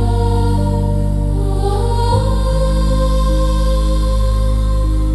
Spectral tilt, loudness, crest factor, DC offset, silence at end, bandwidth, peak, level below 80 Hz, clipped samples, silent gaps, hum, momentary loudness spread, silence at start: -7 dB/octave; -16 LUFS; 10 dB; under 0.1%; 0 s; 12 kHz; -4 dBFS; -16 dBFS; under 0.1%; none; none; 2 LU; 0 s